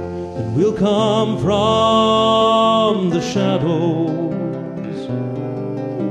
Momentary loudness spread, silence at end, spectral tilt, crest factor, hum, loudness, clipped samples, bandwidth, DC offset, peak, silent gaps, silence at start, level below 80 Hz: 11 LU; 0 s; -6.5 dB/octave; 14 dB; none; -17 LUFS; under 0.1%; 10.5 kHz; under 0.1%; -2 dBFS; none; 0 s; -48 dBFS